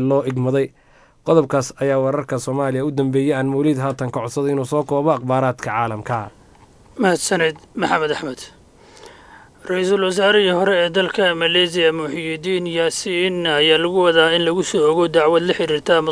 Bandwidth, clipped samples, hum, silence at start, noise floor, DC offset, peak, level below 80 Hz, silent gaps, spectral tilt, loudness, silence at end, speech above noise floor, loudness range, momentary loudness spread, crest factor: 11 kHz; under 0.1%; none; 0 s; -48 dBFS; under 0.1%; 0 dBFS; -56 dBFS; none; -4.5 dB/octave; -18 LUFS; 0 s; 30 dB; 5 LU; 10 LU; 18 dB